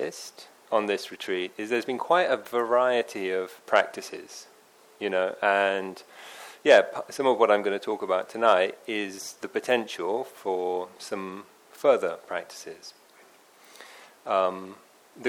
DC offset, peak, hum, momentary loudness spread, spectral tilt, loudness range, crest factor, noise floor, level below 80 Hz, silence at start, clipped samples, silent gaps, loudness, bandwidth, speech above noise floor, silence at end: under 0.1%; -6 dBFS; none; 21 LU; -3.5 dB/octave; 7 LU; 22 dB; -56 dBFS; -82 dBFS; 0 s; under 0.1%; none; -26 LUFS; 17.5 kHz; 30 dB; 0 s